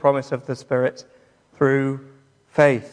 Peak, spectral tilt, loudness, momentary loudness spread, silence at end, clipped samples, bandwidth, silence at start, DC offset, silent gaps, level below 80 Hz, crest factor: -2 dBFS; -7 dB/octave; -21 LUFS; 11 LU; 0.05 s; under 0.1%; 10 kHz; 0 s; under 0.1%; none; -68 dBFS; 20 dB